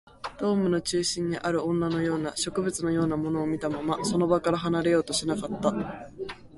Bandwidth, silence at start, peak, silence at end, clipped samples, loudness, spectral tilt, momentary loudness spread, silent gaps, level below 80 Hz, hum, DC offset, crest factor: 11.5 kHz; 0.25 s; -10 dBFS; 0 s; under 0.1%; -27 LUFS; -5 dB/octave; 7 LU; none; -54 dBFS; none; under 0.1%; 18 dB